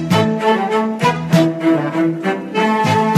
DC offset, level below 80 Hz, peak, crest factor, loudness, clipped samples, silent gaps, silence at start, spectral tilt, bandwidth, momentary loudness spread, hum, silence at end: under 0.1%; -58 dBFS; 0 dBFS; 14 dB; -16 LUFS; under 0.1%; none; 0 s; -6.5 dB/octave; 14.5 kHz; 4 LU; none; 0 s